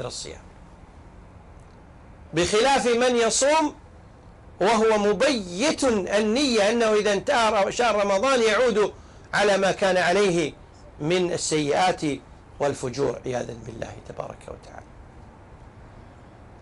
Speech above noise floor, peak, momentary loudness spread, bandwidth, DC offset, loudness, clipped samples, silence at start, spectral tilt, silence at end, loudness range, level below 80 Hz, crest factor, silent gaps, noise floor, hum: 25 dB; -12 dBFS; 16 LU; 11.5 kHz; under 0.1%; -22 LUFS; under 0.1%; 0 s; -3.5 dB/octave; 0.15 s; 10 LU; -50 dBFS; 12 dB; none; -47 dBFS; none